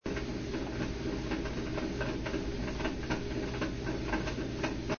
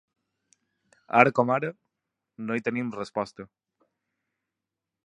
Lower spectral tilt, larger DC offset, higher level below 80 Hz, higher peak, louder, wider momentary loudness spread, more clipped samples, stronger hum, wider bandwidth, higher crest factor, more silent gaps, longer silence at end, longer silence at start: second, -5 dB/octave vs -7 dB/octave; neither; first, -42 dBFS vs -72 dBFS; second, -18 dBFS vs -2 dBFS; second, -36 LUFS vs -26 LUFS; second, 2 LU vs 16 LU; neither; neither; second, 6.8 kHz vs 10.5 kHz; second, 18 dB vs 28 dB; neither; second, 0 s vs 1.6 s; second, 0.05 s vs 1.1 s